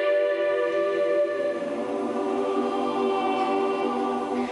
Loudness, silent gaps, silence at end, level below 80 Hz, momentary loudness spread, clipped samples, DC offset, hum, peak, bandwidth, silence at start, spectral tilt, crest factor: -25 LUFS; none; 0 s; -66 dBFS; 4 LU; under 0.1%; under 0.1%; none; -14 dBFS; 11.5 kHz; 0 s; -5 dB/octave; 12 dB